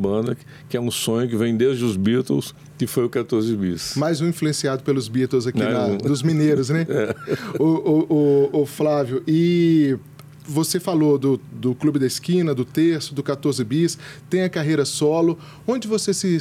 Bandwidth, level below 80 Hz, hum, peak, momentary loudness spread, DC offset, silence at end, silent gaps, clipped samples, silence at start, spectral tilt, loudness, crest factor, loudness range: 16 kHz; -60 dBFS; none; -8 dBFS; 8 LU; under 0.1%; 0 s; none; under 0.1%; 0 s; -6 dB/octave; -21 LUFS; 12 dB; 3 LU